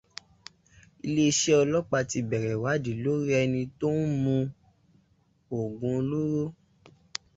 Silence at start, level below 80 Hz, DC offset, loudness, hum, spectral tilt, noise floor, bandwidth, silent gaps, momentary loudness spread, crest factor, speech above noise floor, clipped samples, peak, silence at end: 1.05 s; -60 dBFS; under 0.1%; -27 LUFS; none; -5 dB/octave; -67 dBFS; 8 kHz; none; 14 LU; 18 dB; 40 dB; under 0.1%; -10 dBFS; 0.85 s